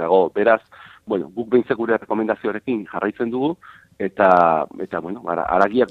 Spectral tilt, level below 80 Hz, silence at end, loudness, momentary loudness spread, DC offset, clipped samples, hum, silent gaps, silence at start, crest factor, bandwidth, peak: -8 dB/octave; -56 dBFS; 0 s; -20 LUFS; 12 LU; under 0.1%; under 0.1%; none; none; 0 s; 20 dB; 6.8 kHz; 0 dBFS